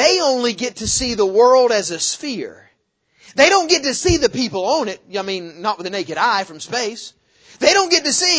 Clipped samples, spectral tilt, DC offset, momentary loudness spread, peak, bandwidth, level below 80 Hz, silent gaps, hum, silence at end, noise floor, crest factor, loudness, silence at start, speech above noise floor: under 0.1%; -2 dB/octave; under 0.1%; 13 LU; 0 dBFS; 8 kHz; -42 dBFS; none; none; 0 s; -64 dBFS; 18 dB; -17 LUFS; 0 s; 46 dB